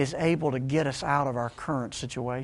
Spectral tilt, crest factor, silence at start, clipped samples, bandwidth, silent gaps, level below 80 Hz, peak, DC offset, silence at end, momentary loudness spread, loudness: -6 dB/octave; 18 dB; 0 s; under 0.1%; 11.5 kHz; none; -54 dBFS; -10 dBFS; under 0.1%; 0 s; 6 LU; -28 LUFS